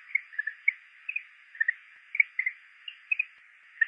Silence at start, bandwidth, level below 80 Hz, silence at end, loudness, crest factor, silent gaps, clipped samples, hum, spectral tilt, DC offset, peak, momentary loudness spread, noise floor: 0.1 s; 5.4 kHz; under -90 dBFS; 0 s; -30 LUFS; 24 dB; none; under 0.1%; none; 3 dB/octave; under 0.1%; -8 dBFS; 19 LU; -56 dBFS